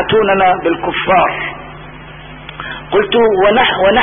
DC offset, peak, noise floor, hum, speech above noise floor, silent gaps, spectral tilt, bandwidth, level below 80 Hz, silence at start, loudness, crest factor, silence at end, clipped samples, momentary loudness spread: under 0.1%; 0 dBFS; -32 dBFS; none; 21 dB; none; -10.5 dB/octave; 3.7 kHz; -40 dBFS; 0 s; -12 LUFS; 14 dB; 0 s; under 0.1%; 22 LU